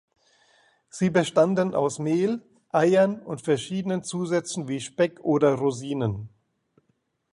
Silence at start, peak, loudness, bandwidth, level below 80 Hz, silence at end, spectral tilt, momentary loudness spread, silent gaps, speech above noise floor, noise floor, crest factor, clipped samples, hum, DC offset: 0.95 s; -6 dBFS; -25 LUFS; 11.5 kHz; -62 dBFS; 1.05 s; -6 dB/octave; 10 LU; none; 48 dB; -72 dBFS; 20 dB; under 0.1%; none; under 0.1%